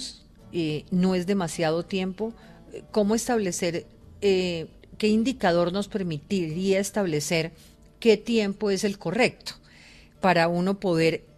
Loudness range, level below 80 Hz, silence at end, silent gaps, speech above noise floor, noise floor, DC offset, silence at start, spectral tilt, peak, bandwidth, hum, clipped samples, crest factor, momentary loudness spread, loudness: 2 LU; -54 dBFS; 0.2 s; none; 26 dB; -51 dBFS; under 0.1%; 0 s; -5 dB/octave; -8 dBFS; 14 kHz; none; under 0.1%; 18 dB; 12 LU; -25 LUFS